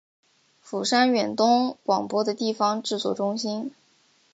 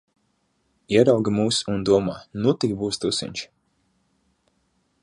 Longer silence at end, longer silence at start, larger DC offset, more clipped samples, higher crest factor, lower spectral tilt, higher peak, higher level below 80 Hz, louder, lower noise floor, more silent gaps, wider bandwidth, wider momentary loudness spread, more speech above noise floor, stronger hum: second, 0.65 s vs 1.55 s; second, 0.65 s vs 0.9 s; neither; neither; about the same, 18 dB vs 20 dB; about the same, -4 dB/octave vs -5 dB/octave; about the same, -6 dBFS vs -4 dBFS; second, -76 dBFS vs -54 dBFS; about the same, -24 LUFS vs -22 LUFS; second, -63 dBFS vs -69 dBFS; neither; second, 9.2 kHz vs 11.5 kHz; second, 9 LU vs 12 LU; second, 39 dB vs 48 dB; neither